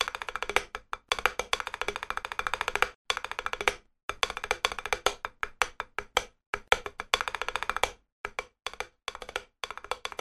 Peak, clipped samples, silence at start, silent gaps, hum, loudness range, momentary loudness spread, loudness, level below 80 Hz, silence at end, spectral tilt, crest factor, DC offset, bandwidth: -4 dBFS; under 0.1%; 0 s; 2.95-3.05 s, 4.03-4.09 s, 6.46-6.53 s, 8.12-8.24 s; none; 2 LU; 10 LU; -32 LUFS; -52 dBFS; 0.05 s; -0.5 dB/octave; 30 dB; under 0.1%; 13.5 kHz